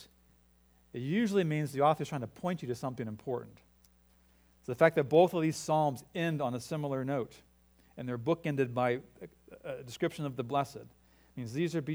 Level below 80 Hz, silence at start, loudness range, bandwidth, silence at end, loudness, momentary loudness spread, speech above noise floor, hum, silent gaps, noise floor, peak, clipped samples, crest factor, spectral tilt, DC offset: -68 dBFS; 0 s; 6 LU; over 20 kHz; 0 s; -32 LUFS; 17 LU; 33 dB; none; none; -66 dBFS; -10 dBFS; under 0.1%; 24 dB; -6.5 dB/octave; under 0.1%